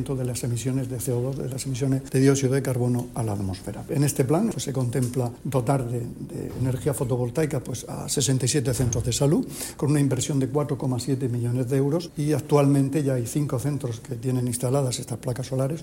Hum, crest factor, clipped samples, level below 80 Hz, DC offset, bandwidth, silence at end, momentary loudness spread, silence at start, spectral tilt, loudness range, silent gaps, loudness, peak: none; 18 dB; under 0.1%; -48 dBFS; under 0.1%; 16.5 kHz; 0 s; 9 LU; 0 s; -6 dB/octave; 2 LU; none; -25 LUFS; -6 dBFS